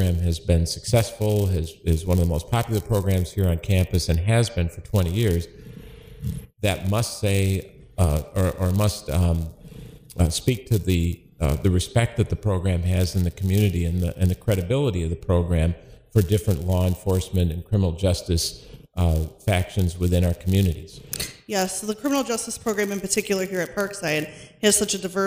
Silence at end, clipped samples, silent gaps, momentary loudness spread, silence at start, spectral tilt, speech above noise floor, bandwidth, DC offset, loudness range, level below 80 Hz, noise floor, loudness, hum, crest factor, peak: 0 s; under 0.1%; none; 7 LU; 0 s; -5.5 dB/octave; 20 dB; 16 kHz; under 0.1%; 2 LU; -34 dBFS; -42 dBFS; -23 LUFS; none; 18 dB; -4 dBFS